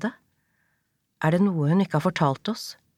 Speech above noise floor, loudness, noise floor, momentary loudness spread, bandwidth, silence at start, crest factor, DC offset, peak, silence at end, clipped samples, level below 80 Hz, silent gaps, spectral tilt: 50 dB; -24 LUFS; -73 dBFS; 10 LU; 14.5 kHz; 0 s; 18 dB; under 0.1%; -8 dBFS; 0.25 s; under 0.1%; -68 dBFS; none; -7 dB/octave